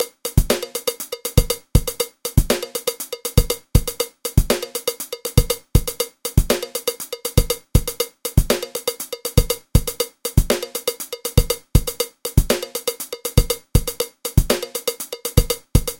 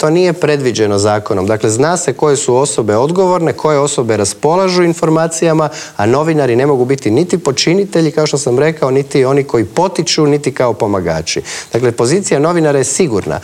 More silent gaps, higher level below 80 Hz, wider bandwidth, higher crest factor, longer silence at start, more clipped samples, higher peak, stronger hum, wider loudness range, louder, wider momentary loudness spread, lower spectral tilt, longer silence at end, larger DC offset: neither; first, -24 dBFS vs -50 dBFS; about the same, 17 kHz vs 15.5 kHz; first, 20 dB vs 10 dB; about the same, 0 s vs 0 s; neither; about the same, 0 dBFS vs 0 dBFS; neither; about the same, 1 LU vs 1 LU; second, -21 LUFS vs -12 LUFS; first, 6 LU vs 3 LU; about the same, -4.5 dB/octave vs -5 dB/octave; about the same, 0.05 s vs 0 s; neither